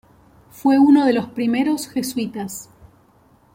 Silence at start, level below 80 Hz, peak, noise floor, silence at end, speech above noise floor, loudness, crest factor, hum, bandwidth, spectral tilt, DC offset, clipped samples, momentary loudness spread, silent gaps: 0.6 s; -58 dBFS; -4 dBFS; -54 dBFS; 0.9 s; 37 dB; -18 LUFS; 16 dB; none; 16.5 kHz; -5 dB/octave; under 0.1%; under 0.1%; 16 LU; none